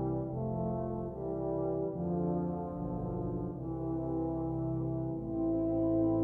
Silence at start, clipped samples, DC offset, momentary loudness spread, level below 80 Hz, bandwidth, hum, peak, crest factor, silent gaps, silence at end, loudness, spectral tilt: 0 s; under 0.1%; under 0.1%; 7 LU; -50 dBFS; 1.9 kHz; none; -20 dBFS; 14 dB; none; 0 s; -35 LUFS; -13.5 dB/octave